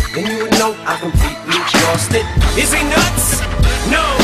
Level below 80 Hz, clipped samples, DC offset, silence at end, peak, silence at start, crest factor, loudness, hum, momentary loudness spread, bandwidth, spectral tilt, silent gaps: -20 dBFS; under 0.1%; under 0.1%; 0 s; -4 dBFS; 0 s; 10 dB; -14 LUFS; none; 5 LU; 15.5 kHz; -3.5 dB/octave; none